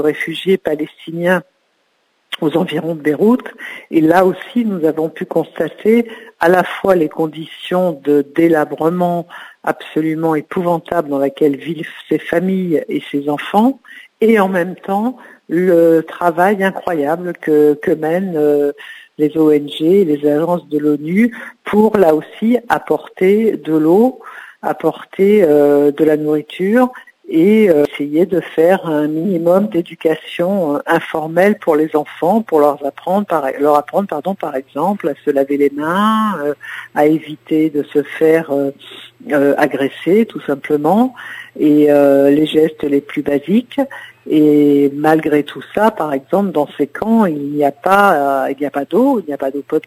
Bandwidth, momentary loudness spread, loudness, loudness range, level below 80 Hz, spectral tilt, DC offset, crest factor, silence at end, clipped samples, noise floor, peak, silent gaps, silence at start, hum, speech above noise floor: 16 kHz; 10 LU; -15 LUFS; 3 LU; -60 dBFS; -7 dB/octave; under 0.1%; 14 dB; 0.05 s; under 0.1%; -62 dBFS; 0 dBFS; none; 0 s; none; 48 dB